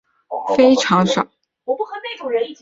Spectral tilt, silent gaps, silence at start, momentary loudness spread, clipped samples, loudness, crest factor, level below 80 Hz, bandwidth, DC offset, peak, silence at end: -5 dB/octave; none; 0.3 s; 14 LU; under 0.1%; -18 LUFS; 16 dB; -60 dBFS; 7.8 kHz; under 0.1%; -2 dBFS; 0.05 s